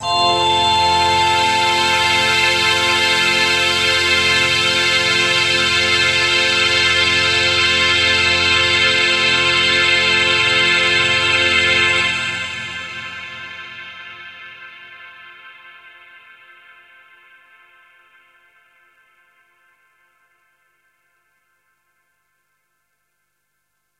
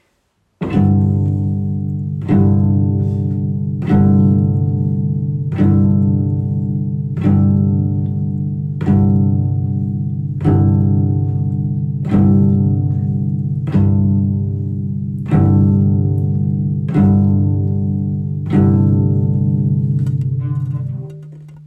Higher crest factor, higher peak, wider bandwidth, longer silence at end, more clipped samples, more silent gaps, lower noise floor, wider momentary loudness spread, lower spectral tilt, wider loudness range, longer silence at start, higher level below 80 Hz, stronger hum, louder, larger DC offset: first, 16 dB vs 10 dB; about the same, -2 dBFS vs -4 dBFS; first, 16 kHz vs 3.5 kHz; first, 8.3 s vs 0 s; neither; neither; first, -71 dBFS vs -63 dBFS; first, 16 LU vs 8 LU; second, -1.5 dB/octave vs -12 dB/octave; first, 14 LU vs 1 LU; second, 0 s vs 0.6 s; second, -50 dBFS vs -40 dBFS; second, 50 Hz at -80 dBFS vs 50 Hz at -35 dBFS; first, -13 LUFS vs -16 LUFS; neither